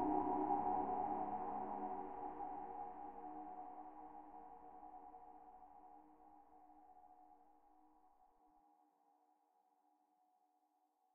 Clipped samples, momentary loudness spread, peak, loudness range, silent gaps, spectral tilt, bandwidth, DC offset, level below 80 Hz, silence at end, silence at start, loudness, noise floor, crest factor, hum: under 0.1%; 26 LU; -26 dBFS; 23 LU; none; -3 dB/octave; 3.4 kHz; under 0.1%; -72 dBFS; 0 s; 0 s; -45 LUFS; -81 dBFS; 22 dB; none